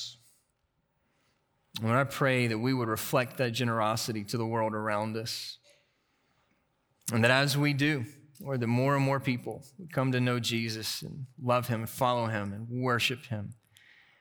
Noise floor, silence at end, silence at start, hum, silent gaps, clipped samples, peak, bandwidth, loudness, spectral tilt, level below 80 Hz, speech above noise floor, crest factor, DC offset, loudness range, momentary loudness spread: -76 dBFS; 0.65 s; 0 s; none; none; under 0.1%; -8 dBFS; over 20 kHz; -30 LUFS; -5 dB/octave; -72 dBFS; 47 dB; 22 dB; under 0.1%; 3 LU; 13 LU